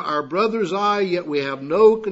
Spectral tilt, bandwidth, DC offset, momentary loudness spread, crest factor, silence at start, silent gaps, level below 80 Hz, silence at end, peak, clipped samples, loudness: -6 dB/octave; 8 kHz; under 0.1%; 8 LU; 16 dB; 0 s; none; -62 dBFS; 0 s; -4 dBFS; under 0.1%; -20 LUFS